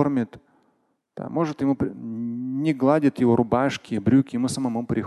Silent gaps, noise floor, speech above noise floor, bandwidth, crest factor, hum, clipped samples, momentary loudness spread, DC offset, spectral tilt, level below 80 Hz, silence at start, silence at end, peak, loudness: none; -69 dBFS; 46 dB; 12 kHz; 18 dB; none; under 0.1%; 11 LU; under 0.1%; -7 dB/octave; -54 dBFS; 0 s; 0 s; -4 dBFS; -23 LUFS